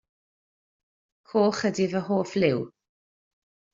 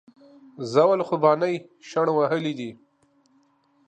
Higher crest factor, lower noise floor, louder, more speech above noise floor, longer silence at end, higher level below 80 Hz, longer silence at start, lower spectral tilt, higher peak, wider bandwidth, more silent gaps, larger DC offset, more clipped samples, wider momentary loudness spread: about the same, 20 dB vs 20 dB; first, under -90 dBFS vs -64 dBFS; about the same, -25 LUFS vs -23 LUFS; first, over 66 dB vs 41 dB; about the same, 1.05 s vs 1.15 s; first, -68 dBFS vs -76 dBFS; first, 1.35 s vs 0.6 s; about the same, -5.5 dB/octave vs -6.5 dB/octave; about the same, -8 dBFS vs -6 dBFS; second, 7.8 kHz vs 9 kHz; neither; neither; neither; second, 6 LU vs 14 LU